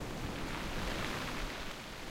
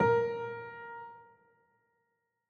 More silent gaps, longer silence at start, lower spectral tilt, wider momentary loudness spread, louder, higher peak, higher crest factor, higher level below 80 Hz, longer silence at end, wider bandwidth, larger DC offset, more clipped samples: neither; about the same, 0 s vs 0 s; second, -4 dB/octave vs -7.5 dB/octave; second, 5 LU vs 21 LU; second, -40 LUFS vs -35 LUFS; second, -20 dBFS vs -16 dBFS; about the same, 18 dB vs 20 dB; first, -46 dBFS vs -70 dBFS; second, 0 s vs 1.25 s; first, 16 kHz vs 6.6 kHz; neither; neither